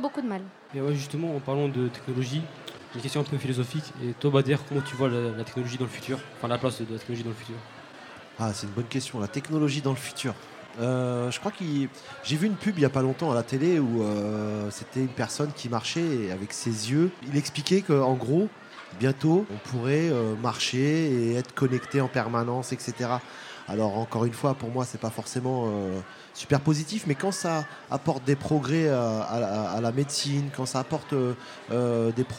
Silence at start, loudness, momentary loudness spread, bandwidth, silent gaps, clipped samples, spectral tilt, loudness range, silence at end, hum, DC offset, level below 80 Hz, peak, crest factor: 0 s; -28 LUFS; 10 LU; 16 kHz; none; under 0.1%; -6 dB/octave; 5 LU; 0 s; none; under 0.1%; -66 dBFS; -6 dBFS; 22 dB